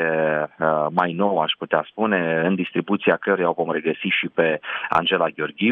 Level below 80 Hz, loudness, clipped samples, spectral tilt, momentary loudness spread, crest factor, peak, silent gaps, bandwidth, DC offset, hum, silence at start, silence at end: -66 dBFS; -21 LUFS; under 0.1%; -7.5 dB/octave; 4 LU; 18 dB; -4 dBFS; none; 6.2 kHz; under 0.1%; none; 0 s; 0 s